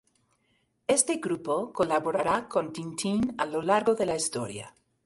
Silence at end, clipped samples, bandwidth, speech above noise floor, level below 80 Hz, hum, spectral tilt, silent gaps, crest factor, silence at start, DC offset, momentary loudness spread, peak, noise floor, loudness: 0.35 s; under 0.1%; 12 kHz; 44 dB; -62 dBFS; none; -3.5 dB/octave; none; 22 dB; 0.9 s; under 0.1%; 11 LU; -8 dBFS; -72 dBFS; -28 LUFS